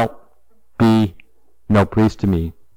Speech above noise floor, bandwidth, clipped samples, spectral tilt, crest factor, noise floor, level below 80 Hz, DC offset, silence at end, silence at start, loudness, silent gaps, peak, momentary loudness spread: 46 dB; 16 kHz; under 0.1%; -8 dB/octave; 14 dB; -61 dBFS; -40 dBFS; 0.7%; 0.25 s; 0 s; -17 LUFS; none; -6 dBFS; 9 LU